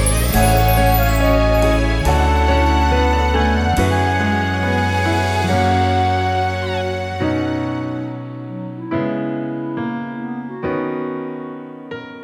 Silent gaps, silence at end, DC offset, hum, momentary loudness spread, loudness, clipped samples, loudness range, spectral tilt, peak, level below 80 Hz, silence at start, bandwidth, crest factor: none; 0 s; under 0.1%; none; 13 LU; -18 LUFS; under 0.1%; 9 LU; -5.5 dB/octave; -2 dBFS; -24 dBFS; 0 s; 19.5 kHz; 14 dB